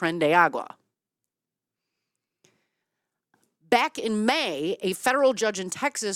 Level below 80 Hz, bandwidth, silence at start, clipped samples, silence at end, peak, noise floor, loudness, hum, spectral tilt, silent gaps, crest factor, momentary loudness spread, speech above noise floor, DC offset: -74 dBFS; 16.5 kHz; 0 s; under 0.1%; 0 s; -4 dBFS; -88 dBFS; -24 LUFS; none; -3.5 dB/octave; none; 22 dB; 8 LU; 64 dB; under 0.1%